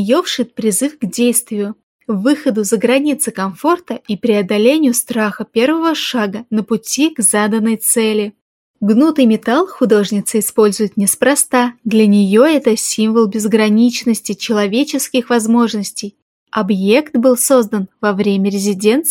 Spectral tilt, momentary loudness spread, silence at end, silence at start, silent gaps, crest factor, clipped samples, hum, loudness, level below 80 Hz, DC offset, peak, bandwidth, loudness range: -4 dB/octave; 8 LU; 0 s; 0 s; 1.83-1.99 s, 8.41-8.74 s, 16.22-16.46 s; 14 dB; under 0.1%; none; -14 LUFS; -64 dBFS; under 0.1%; 0 dBFS; 17 kHz; 3 LU